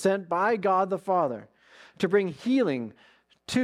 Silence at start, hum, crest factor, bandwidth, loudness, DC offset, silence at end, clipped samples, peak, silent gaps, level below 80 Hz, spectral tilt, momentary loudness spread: 0 s; none; 16 dB; 13 kHz; -26 LUFS; under 0.1%; 0 s; under 0.1%; -12 dBFS; none; -70 dBFS; -6 dB/octave; 11 LU